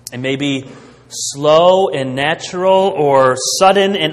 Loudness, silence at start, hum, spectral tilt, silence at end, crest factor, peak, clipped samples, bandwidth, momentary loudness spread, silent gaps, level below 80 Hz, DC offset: -13 LUFS; 0.05 s; none; -3.5 dB/octave; 0 s; 14 dB; 0 dBFS; under 0.1%; 14 kHz; 11 LU; none; -54 dBFS; under 0.1%